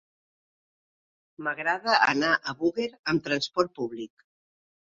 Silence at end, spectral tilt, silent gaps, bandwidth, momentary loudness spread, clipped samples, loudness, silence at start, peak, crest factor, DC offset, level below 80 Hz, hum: 0.8 s; -4 dB/octave; 2.99-3.04 s; 7.8 kHz; 13 LU; under 0.1%; -26 LUFS; 1.4 s; -6 dBFS; 22 dB; under 0.1%; -68 dBFS; none